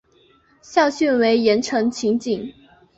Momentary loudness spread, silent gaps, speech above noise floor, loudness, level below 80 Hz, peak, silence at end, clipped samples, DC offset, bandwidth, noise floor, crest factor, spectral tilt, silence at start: 10 LU; none; 38 dB; -19 LUFS; -60 dBFS; -2 dBFS; 0.45 s; under 0.1%; under 0.1%; 8 kHz; -56 dBFS; 18 dB; -4.5 dB/octave; 0.7 s